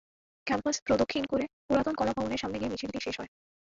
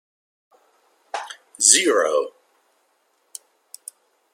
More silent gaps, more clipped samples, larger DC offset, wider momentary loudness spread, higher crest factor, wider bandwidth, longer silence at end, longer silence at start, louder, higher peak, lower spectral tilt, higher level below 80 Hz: first, 0.82-0.86 s, 1.53-1.69 s vs none; neither; neither; second, 9 LU vs 27 LU; second, 18 dB vs 26 dB; second, 7.8 kHz vs 16.5 kHz; second, 0.5 s vs 2.05 s; second, 0.45 s vs 1.15 s; second, -31 LUFS vs -16 LUFS; second, -14 dBFS vs 0 dBFS; first, -4 dB/octave vs 1 dB/octave; first, -54 dBFS vs -82 dBFS